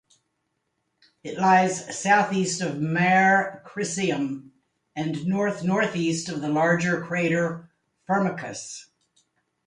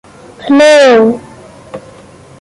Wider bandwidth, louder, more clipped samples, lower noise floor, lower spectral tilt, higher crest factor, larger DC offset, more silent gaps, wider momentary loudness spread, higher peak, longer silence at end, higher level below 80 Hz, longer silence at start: about the same, 11 kHz vs 11.5 kHz; second, -24 LUFS vs -6 LUFS; neither; first, -76 dBFS vs -36 dBFS; about the same, -5 dB/octave vs -4 dB/octave; first, 18 dB vs 10 dB; neither; neither; second, 16 LU vs 25 LU; second, -6 dBFS vs 0 dBFS; first, 0.85 s vs 0.65 s; second, -66 dBFS vs -50 dBFS; first, 1.25 s vs 0.4 s